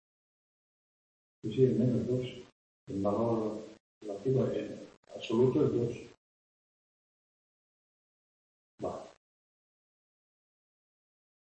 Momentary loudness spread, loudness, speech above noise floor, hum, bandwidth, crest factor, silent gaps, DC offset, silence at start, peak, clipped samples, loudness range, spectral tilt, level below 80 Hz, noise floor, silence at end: 19 LU; -32 LUFS; over 60 dB; none; 8.6 kHz; 22 dB; 2.52-2.87 s, 3.80-4.01 s, 4.97-5.03 s, 6.18-8.78 s; under 0.1%; 1.45 s; -14 dBFS; under 0.1%; 17 LU; -8.5 dB/octave; -68 dBFS; under -90 dBFS; 2.35 s